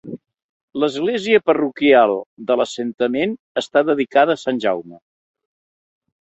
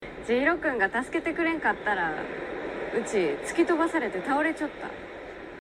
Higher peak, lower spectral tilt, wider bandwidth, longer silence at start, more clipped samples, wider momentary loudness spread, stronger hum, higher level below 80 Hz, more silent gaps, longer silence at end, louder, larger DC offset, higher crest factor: first, -2 dBFS vs -12 dBFS; about the same, -5 dB/octave vs -4.5 dB/octave; second, 8.2 kHz vs 12 kHz; about the same, 0.05 s vs 0 s; neither; about the same, 11 LU vs 13 LU; neither; second, -64 dBFS vs -56 dBFS; first, 0.42-0.68 s, 2.26-2.37 s, 2.94-2.98 s, 3.39-3.55 s vs none; first, 1.25 s vs 0 s; first, -18 LUFS vs -27 LUFS; neither; about the same, 18 dB vs 16 dB